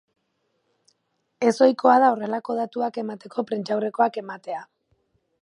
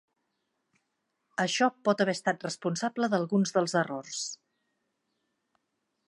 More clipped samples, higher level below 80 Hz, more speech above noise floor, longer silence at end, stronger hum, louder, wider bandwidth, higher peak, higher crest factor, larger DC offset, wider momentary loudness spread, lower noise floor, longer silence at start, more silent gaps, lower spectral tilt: neither; about the same, -78 dBFS vs -82 dBFS; about the same, 51 dB vs 52 dB; second, 0.75 s vs 1.7 s; neither; first, -22 LUFS vs -29 LUFS; about the same, 11 kHz vs 11.5 kHz; first, -4 dBFS vs -10 dBFS; about the same, 22 dB vs 22 dB; neither; first, 16 LU vs 9 LU; second, -73 dBFS vs -80 dBFS; about the same, 1.4 s vs 1.4 s; neither; about the same, -5.5 dB/octave vs -4.5 dB/octave